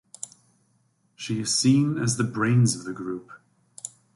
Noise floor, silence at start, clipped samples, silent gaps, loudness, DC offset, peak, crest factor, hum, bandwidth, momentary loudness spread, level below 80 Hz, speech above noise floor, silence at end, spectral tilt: -67 dBFS; 1.2 s; under 0.1%; none; -24 LUFS; under 0.1%; -8 dBFS; 18 dB; none; 11.5 kHz; 19 LU; -62 dBFS; 44 dB; 0.25 s; -4.5 dB/octave